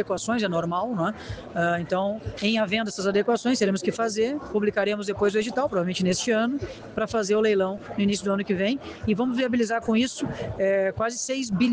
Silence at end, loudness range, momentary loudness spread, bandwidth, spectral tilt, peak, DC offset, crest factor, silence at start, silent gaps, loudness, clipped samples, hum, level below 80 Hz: 0 s; 1 LU; 5 LU; 10 kHz; -5 dB/octave; -10 dBFS; under 0.1%; 14 dB; 0 s; none; -25 LUFS; under 0.1%; none; -52 dBFS